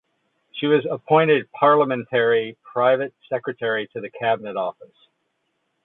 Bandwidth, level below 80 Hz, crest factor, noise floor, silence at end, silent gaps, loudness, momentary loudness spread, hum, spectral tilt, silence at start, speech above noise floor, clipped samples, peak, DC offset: 4.1 kHz; -72 dBFS; 18 dB; -73 dBFS; 1 s; none; -21 LUFS; 11 LU; none; -10 dB/octave; 0.55 s; 52 dB; under 0.1%; -4 dBFS; under 0.1%